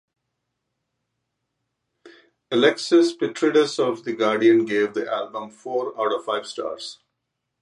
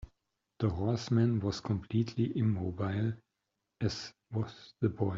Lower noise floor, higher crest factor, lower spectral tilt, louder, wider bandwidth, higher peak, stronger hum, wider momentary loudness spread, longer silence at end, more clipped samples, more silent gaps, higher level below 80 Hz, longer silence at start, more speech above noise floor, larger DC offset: second, -79 dBFS vs -85 dBFS; about the same, 18 dB vs 18 dB; second, -4.5 dB/octave vs -7.5 dB/octave; first, -21 LUFS vs -34 LUFS; first, 11 kHz vs 7.6 kHz; first, -4 dBFS vs -16 dBFS; neither; first, 13 LU vs 9 LU; first, 0.7 s vs 0 s; neither; neither; second, -76 dBFS vs -60 dBFS; first, 2.05 s vs 0 s; first, 58 dB vs 53 dB; neither